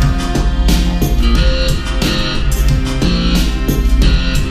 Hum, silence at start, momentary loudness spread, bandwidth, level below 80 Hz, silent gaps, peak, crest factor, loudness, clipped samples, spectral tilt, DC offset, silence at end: none; 0 s; 3 LU; 15.5 kHz; -14 dBFS; none; 0 dBFS; 12 dB; -15 LUFS; under 0.1%; -5 dB/octave; under 0.1%; 0 s